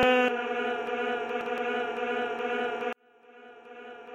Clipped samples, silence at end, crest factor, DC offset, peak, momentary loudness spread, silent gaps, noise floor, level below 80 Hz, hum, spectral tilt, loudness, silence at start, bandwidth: under 0.1%; 0 s; 18 dB; under 0.1%; -12 dBFS; 19 LU; none; -55 dBFS; -64 dBFS; none; -4.5 dB/octave; -30 LUFS; 0 s; 9 kHz